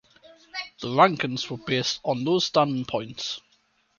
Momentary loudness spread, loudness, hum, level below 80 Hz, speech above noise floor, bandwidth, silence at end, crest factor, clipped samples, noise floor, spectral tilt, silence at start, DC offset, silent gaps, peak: 15 LU; -25 LUFS; none; -64 dBFS; 42 dB; 7.2 kHz; 0.6 s; 24 dB; under 0.1%; -66 dBFS; -4.5 dB/octave; 0.55 s; under 0.1%; none; -2 dBFS